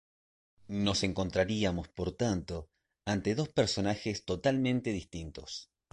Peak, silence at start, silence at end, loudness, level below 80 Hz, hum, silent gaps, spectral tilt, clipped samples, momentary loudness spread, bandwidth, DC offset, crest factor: -14 dBFS; 0.7 s; 0.3 s; -33 LUFS; -52 dBFS; none; none; -5 dB/octave; under 0.1%; 13 LU; 11.5 kHz; under 0.1%; 18 dB